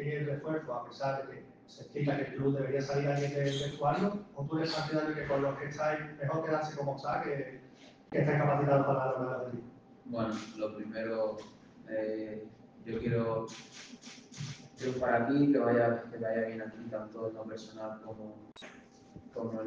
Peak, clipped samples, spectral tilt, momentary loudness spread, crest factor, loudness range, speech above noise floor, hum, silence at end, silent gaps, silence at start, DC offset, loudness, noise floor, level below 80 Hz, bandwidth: -14 dBFS; under 0.1%; -7 dB/octave; 20 LU; 20 dB; 6 LU; 23 dB; none; 0 s; none; 0 s; under 0.1%; -34 LUFS; -56 dBFS; -68 dBFS; 7.8 kHz